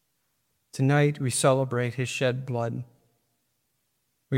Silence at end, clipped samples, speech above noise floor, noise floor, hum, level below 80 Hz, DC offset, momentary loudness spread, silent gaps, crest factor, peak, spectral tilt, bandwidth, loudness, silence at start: 0 s; under 0.1%; 50 dB; -75 dBFS; none; -70 dBFS; under 0.1%; 10 LU; none; 18 dB; -8 dBFS; -5.5 dB/octave; 16 kHz; -26 LUFS; 0.75 s